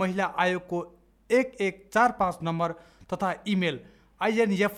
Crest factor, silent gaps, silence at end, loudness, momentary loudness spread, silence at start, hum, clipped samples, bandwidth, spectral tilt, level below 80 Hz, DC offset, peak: 18 dB; none; 0 s; -27 LUFS; 10 LU; 0 s; none; under 0.1%; 15 kHz; -6 dB/octave; -60 dBFS; under 0.1%; -8 dBFS